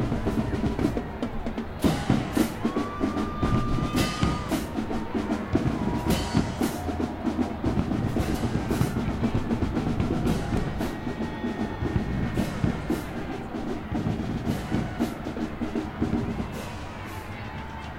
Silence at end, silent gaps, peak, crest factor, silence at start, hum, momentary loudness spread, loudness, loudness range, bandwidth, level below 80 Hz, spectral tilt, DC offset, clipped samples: 0 s; none; -8 dBFS; 20 dB; 0 s; none; 7 LU; -28 LUFS; 3 LU; 16 kHz; -36 dBFS; -6.5 dB/octave; under 0.1%; under 0.1%